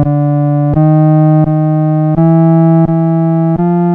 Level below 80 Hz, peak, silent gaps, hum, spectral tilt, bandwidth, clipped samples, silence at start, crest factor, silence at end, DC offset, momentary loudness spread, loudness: -36 dBFS; 0 dBFS; none; none; -13 dB/octave; 2.8 kHz; under 0.1%; 0 s; 8 dB; 0 s; under 0.1%; 4 LU; -10 LUFS